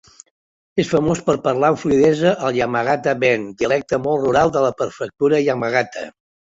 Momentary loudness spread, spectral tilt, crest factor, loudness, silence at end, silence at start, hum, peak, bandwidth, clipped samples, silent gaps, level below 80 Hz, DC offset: 8 LU; -6 dB/octave; 16 dB; -18 LUFS; 0.45 s; 0.75 s; none; -2 dBFS; 8 kHz; under 0.1%; none; -50 dBFS; under 0.1%